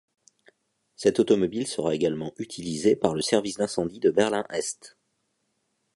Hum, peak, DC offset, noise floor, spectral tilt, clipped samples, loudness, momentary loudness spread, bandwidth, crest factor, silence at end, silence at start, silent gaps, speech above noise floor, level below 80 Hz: none; -6 dBFS; under 0.1%; -75 dBFS; -4.5 dB/octave; under 0.1%; -25 LUFS; 11 LU; 11.5 kHz; 22 dB; 1.05 s; 1 s; none; 50 dB; -62 dBFS